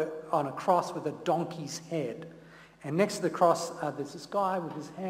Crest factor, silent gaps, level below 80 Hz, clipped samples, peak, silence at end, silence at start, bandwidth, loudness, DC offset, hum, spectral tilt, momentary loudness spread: 20 dB; none; -72 dBFS; under 0.1%; -10 dBFS; 0 s; 0 s; 16 kHz; -31 LUFS; under 0.1%; none; -5.5 dB/octave; 13 LU